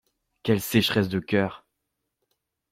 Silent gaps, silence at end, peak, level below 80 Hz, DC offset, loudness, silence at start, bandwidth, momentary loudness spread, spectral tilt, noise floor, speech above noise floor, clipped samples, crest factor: none; 1.15 s; -6 dBFS; -60 dBFS; under 0.1%; -25 LUFS; 0.45 s; 16.5 kHz; 8 LU; -5.5 dB/octave; -81 dBFS; 57 dB; under 0.1%; 20 dB